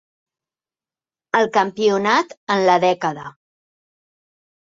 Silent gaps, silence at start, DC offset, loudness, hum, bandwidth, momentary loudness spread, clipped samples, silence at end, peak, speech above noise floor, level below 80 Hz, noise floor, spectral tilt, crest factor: 2.37-2.47 s; 1.35 s; under 0.1%; -18 LUFS; none; 7.6 kHz; 9 LU; under 0.1%; 1.4 s; -2 dBFS; over 72 dB; -68 dBFS; under -90 dBFS; -4.5 dB/octave; 20 dB